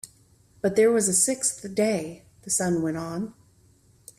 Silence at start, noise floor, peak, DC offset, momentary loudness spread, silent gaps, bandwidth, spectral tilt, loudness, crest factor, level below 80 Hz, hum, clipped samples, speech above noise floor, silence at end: 0.05 s; -59 dBFS; -8 dBFS; under 0.1%; 17 LU; none; 15 kHz; -4 dB/octave; -24 LUFS; 18 dB; -62 dBFS; none; under 0.1%; 35 dB; 0.85 s